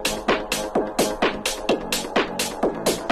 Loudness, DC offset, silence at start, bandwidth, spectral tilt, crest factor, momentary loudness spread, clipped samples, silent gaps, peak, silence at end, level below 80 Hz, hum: -23 LUFS; under 0.1%; 0 s; 13.5 kHz; -2.5 dB/octave; 18 dB; 2 LU; under 0.1%; none; -6 dBFS; 0 s; -44 dBFS; none